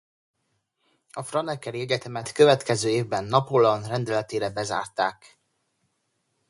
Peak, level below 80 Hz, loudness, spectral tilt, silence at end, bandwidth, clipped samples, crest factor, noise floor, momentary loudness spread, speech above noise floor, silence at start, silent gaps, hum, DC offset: -4 dBFS; -64 dBFS; -24 LUFS; -5 dB/octave; 1.35 s; 11.5 kHz; under 0.1%; 22 dB; -75 dBFS; 12 LU; 51 dB; 1.15 s; none; none; under 0.1%